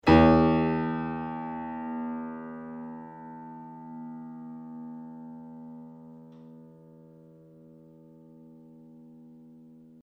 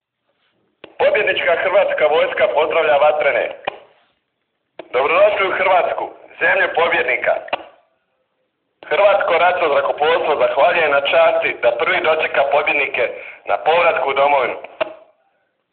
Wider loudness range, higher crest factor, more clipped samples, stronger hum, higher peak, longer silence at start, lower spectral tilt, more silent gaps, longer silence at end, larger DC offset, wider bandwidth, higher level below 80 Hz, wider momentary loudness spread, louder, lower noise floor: first, 22 LU vs 3 LU; first, 24 dB vs 14 dB; neither; neither; second, -6 dBFS vs -2 dBFS; second, 0.05 s vs 1 s; first, -8.5 dB/octave vs 0.5 dB/octave; neither; second, 0.45 s vs 0.75 s; neither; first, 6.6 kHz vs 4.5 kHz; first, -46 dBFS vs -60 dBFS; first, 28 LU vs 10 LU; second, -28 LUFS vs -16 LUFS; second, -53 dBFS vs -72 dBFS